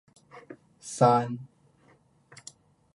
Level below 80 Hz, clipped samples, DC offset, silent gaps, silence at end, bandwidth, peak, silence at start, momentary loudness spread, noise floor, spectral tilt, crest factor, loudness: -74 dBFS; under 0.1%; under 0.1%; none; 1.5 s; 11.5 kHz; -8 dBFS; 0.35 s; 26 LU; -62 dBFS; -6 dB/octave; 24 dB; -25 LUFS